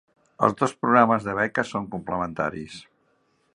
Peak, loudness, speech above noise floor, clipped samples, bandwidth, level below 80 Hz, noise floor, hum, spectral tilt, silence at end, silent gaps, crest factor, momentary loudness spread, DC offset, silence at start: -2 dBFS; -23 LUFS; 44 dB; under 0.1%; 10.5 kHz; -58 dBFS; -67 dBFS; none; -6 dB/octave; 0.7 s; none; 24 dB; 15 LU; under 0.1%; 0.4 s